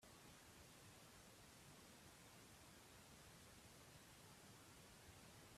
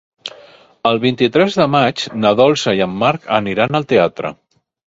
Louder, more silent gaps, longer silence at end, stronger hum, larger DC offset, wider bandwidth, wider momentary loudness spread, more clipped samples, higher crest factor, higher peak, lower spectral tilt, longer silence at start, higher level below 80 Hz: second, -64 LUFS vs -15 LUFS; neither; second, 0 s vs 0.65 s; neither; neither; first, 15.5 kHz vs 7.8 kHz; second, 1 LU vs 13 LU; neither; about the same, 12 dB vs 16 dB; second, -52 dBFS vs 0 dBFS; second, -3 dB/octave vs -5.5 dB/octave; second, 0 s vs 0.25 s; second, -78 dBFS vs -52 dBFS